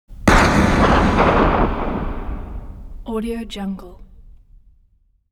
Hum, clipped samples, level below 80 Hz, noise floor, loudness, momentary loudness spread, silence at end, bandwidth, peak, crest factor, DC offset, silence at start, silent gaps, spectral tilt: none; under 0.1%; -26 dBFS; -58 dBFS; -17 LUFS; 20 LU; 1 s; 15.5 kHz; 0 dBFS; 18 dB; under 0.1%; 0.1 s; none; -6 dB/octave